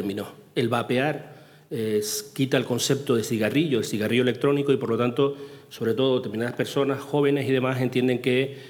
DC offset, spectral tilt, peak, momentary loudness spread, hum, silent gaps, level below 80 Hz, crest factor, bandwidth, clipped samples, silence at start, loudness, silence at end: under 0.1%; -5 dB/octave; -6 dBFS; 8 LU; none; none; -74 dBFS; 18 dB; 19 kHz; under 0.1%; 0 s; -24 LUFS; 0 s